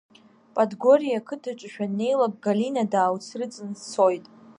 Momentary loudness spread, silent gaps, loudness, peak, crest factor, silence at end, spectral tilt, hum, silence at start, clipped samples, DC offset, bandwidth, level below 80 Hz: 14 LU; none; -24 LUFS; -6 dBFS; 18 dB; 0.4 s; -6 dB/octave; none; 0.55 s; under 0.1%; under 0.1%; 10.5 kHz; -78 dBFS